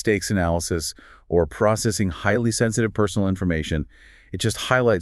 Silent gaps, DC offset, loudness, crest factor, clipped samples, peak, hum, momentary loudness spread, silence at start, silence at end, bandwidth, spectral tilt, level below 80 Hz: none; under 0.1%; -22 LUFS; 18 dB; under 0.1%; -4 dBFS; none; 7 LU; 0 s; 0 s; 13.5 kHz; -5 dB/octave; -40 dBFS